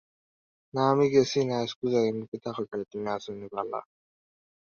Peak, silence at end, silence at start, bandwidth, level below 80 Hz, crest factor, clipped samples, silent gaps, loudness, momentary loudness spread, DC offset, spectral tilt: -10 dBFS; 0.85 s; 0.75 s; 7 kHz; -68 dBFS; 20 dB; under 0.1%; 1.76-1.82 s, 2.28-2.32 s; -28 LUFS; 13 LU; under 0.1%; -6 dB/octave